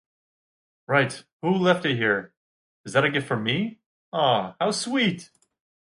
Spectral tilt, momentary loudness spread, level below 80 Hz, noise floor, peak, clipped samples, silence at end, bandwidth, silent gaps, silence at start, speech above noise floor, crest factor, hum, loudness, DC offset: -5 dB/octave; 9 LU; -68 dBFS; under -90 dBFS; -4 dBFS; under 0.1%; 0.6 s; 11.5 kHz; 1.33-1.40 s, 2.37-2.84 s, 3.86-4.12 s; 0.9 s; over 67 dB; 22 dB; none; -24 LUFS; under 0.1%